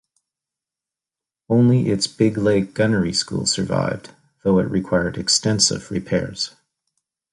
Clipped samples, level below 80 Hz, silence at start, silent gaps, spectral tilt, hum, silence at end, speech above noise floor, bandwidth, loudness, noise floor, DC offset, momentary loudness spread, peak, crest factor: under 0.1%; -48 dBFS; 1.5 s; none; -4.5 dB/octave; none; 0.85 s; 70 dB; 11.5 kHz; -20 LUFS; -89 dBFS; under 0.1%; 10 LU; -2 dBFS; 18 dB